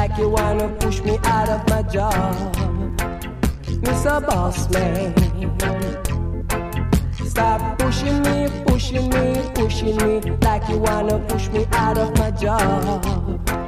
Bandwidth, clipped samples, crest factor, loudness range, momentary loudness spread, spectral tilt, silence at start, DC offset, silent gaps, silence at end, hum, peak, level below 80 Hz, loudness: 15.5 kHz; under 0.1%; 18 dB; 2 LU; 5 LU; -6 dB/octave; 0 s; under 0.1%; none; 0 s; none; -2 dBFS; -26 dBFS; -20 LUFS